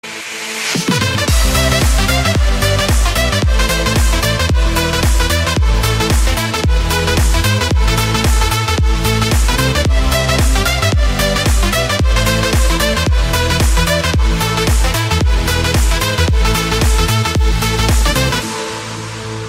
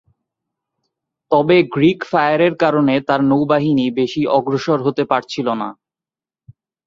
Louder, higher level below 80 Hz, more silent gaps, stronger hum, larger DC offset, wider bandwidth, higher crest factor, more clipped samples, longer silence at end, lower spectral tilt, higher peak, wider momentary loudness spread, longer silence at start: about the same, -14 LUFS vs -16 LUFS; first, -16 dBFS vs -58 dBFS; neither; neither; neither; first, 16.5 kHz vs 7.4 kHz; about the same, 12 dB vs 16 dB; neither; second, 0 s vs 1.15 s; second, -4 dB/octave vs -7 dB/octave; about the same, 0 dBFS vs -2 dBFS; second, 2 LU vs 6 LU; second, 0.05 s vs 1.3 s